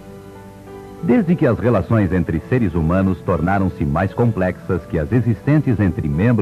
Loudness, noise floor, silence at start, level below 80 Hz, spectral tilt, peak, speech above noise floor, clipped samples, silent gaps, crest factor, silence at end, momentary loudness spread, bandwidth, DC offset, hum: -18 LUFS; -37 dBFS; 0 s; -36 dBFS; -9.5 dB/octave; -4 dBFS; 21 dB; under 0.1%; none; 14 dB; 0 s; 20 LU; 13 kHz; under 0.1%; none